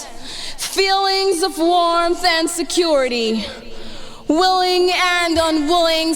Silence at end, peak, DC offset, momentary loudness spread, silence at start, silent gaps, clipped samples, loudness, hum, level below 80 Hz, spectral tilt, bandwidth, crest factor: 0 s; -4 dBFS; under 0.1%; 15 LU; 0 s; none; under 0.1%; -16 LUFS; none; -40 dBFS; -2 dB/octave; 19.5 kHz; 14 dB